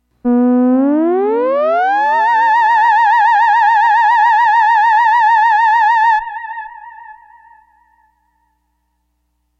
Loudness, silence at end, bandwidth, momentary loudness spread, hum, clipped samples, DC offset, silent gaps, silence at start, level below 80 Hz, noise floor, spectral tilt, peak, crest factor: -11 LUFS; 2.5 s; 7.6 kHz; 5 LU; 60 Hz at -60 dBFS; under 0.1%; under 0.1%; none; 0.25 s; -60 dBFS; -65 dBFS; -4.5 dB/octave; -2 dBFS; 10 dB